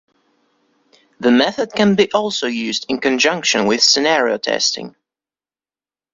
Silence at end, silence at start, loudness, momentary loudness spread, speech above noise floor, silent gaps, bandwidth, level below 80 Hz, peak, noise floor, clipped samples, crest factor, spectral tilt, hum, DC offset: 1.25 s; 1.2 s; -15 LUFS; 8 LU; over 74 dB; none; 7.8 kHz; -60 dBFS; -2 dBFS; under -90 dBFS; under 0.1%; 18 dB; -3 dB/octave; none; under 0.1%